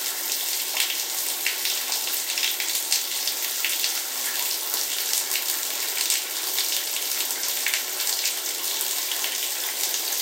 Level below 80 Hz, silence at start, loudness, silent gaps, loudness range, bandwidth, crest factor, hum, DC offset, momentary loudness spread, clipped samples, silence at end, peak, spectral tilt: under -90 dBFS; 0 s; -23 LUFS; none; 0 LU; 17 kHz; 22 dB; none; under 0.1%; 2 LU; under 0.1%; 0 s; -4 dBFS; 4 dB/octave